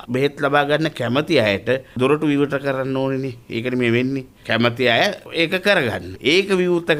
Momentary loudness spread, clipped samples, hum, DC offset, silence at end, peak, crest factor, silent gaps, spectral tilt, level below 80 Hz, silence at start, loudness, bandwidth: 7 LU; under 0.1%; none; under 0.1%; 0 s; -2 dBFS; 16 dB; none; -5.5 dB/octave; -54 dBFS; 0 s; -19 LUFS; 15.5 kHz